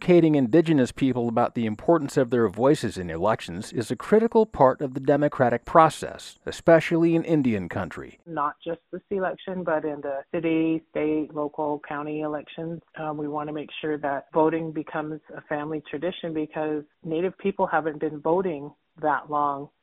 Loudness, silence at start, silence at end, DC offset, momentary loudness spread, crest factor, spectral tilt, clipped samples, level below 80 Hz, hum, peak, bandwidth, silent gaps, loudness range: -25 LUFS; 0 s; 0.15 s; under 0.1%; 13 LU; 22 dB; -7 dB/octave; under 0.1%; -56 dBFS; none; -2 dBFS; 12.5 kHz; none; 7 LU